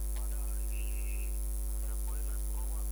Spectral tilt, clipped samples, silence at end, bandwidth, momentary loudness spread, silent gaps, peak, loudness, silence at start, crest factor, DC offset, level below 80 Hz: -4.5 dB/octave; under 0.1%; 0 s; over 20 kHz; 0 LU; none; -26 dBFS; -38 LUFS; 0 s; 10 dB; under 0.1%; -34 dBFS